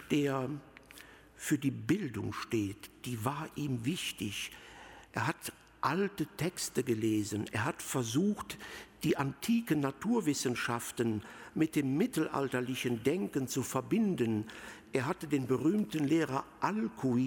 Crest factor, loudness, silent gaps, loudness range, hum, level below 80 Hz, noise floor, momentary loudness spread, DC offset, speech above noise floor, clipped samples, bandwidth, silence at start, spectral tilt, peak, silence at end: 18 dB; -34 LUFS; none; 4 LU; none; -66 dBFS; -55 dBFS; 11 LU; under 0.1%; 22 dB; under 0.1%; 17 kHz; 0 s; -5 dB/octave; -16 dBFS; 0 s